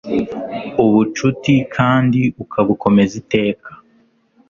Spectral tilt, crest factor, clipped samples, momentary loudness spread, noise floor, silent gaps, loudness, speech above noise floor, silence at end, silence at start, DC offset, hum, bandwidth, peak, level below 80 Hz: -7 dB/octave; 16 dB; under 0.1%; 8 LU; -56 dBFS; none; -16 LUFS; 41 dB; 0.75 s; 0.05 s; under 0.1%; none; 7.4 kHz; 0 dBFS; -48 dBFS